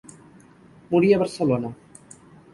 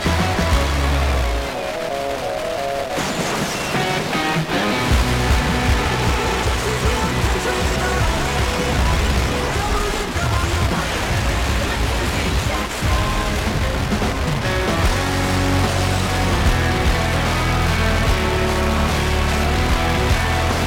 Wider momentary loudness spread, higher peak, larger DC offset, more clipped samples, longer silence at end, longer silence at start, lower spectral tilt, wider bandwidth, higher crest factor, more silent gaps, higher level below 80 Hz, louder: first, 8 LU vs 3 LU; about the same, -6 dBFS vs -6 dBFS; neither; neither; first, 0.8 s vs 0 s; first, 0.9 s vs 0 s; first, -7 dB/octave vs -4.5 dB/octave; second, 11.5 kHz vs 17 kHz; first, 18 dB vs 12 dB; neither; second, -60 dBFS vs -24 dBFS; about the same, -21 LUFS vs -19 LUFS